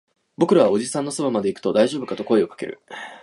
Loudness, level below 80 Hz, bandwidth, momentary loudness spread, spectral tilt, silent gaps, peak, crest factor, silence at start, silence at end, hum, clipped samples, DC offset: -21 LUFS; -66 dBFS; 11.5 kHz; 16 LU; -5.5 dB/octave; none; -4 dBFS; 18 dB; 0.4 s; 0.05 s; none; under 0.1%; under 0.1%